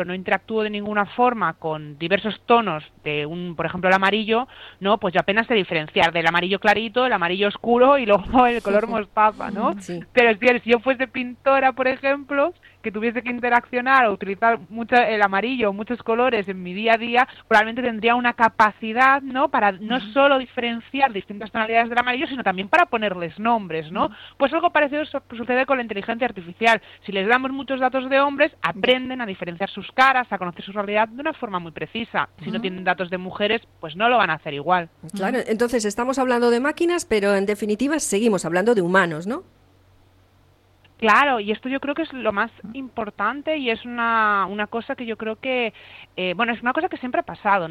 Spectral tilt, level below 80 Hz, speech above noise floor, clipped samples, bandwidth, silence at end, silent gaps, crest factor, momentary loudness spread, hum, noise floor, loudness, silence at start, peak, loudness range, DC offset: -4.5 dB/octave; -54 dBFS; 35 dB; under 0.1%; 13.5 kHz; 0 s; none; 18 dB; 11 LU; none; -57 dBFS; -21 LUFS; 0 s; -2 dBFS; 5 LU; under 0.1%